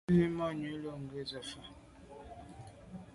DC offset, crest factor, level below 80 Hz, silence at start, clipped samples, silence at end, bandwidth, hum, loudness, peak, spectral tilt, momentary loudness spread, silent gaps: under 0.1%; 20 dB; -60 dBFS; 0.1 s; under 0.1%; 0 s; 11.5 kHz; none; -37 LUFS; -18 dBFS; -7 dB/octave; 22 LU; none